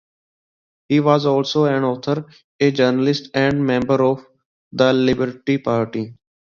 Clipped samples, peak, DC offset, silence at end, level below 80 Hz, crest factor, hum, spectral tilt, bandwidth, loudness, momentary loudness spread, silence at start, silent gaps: under 0.1%; 0 dBFS; under 0.1%; 0.45 s; -54 dBFS; 18 dB; none; -6.5 dB/octave; 7.2 kHz; -18 LUFS; 9 LU; 0.9 s; 2.44-2.59 s, 4.45-4.71 s